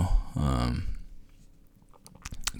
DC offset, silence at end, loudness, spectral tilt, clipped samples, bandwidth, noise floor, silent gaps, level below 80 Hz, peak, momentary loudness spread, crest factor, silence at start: under 0.1%; 0 s; -31 LUFS; -5 dB/octave; under 0.1%; 19.5 kHz; -55 dBFS; none; -34 dBFS; -8 dBFS; 18 LU; 22 dB; 0 s